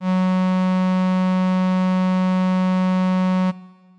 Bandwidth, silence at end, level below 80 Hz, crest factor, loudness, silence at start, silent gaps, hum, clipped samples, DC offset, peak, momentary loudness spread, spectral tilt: 6.8 kHz; 0.3 s; -84 dBFS; 4 dB; -19 LUFS; 0 s; none; none; under 0.1%; 0.1%; -14 dBFS; 1 LU; -8.5 dB/octave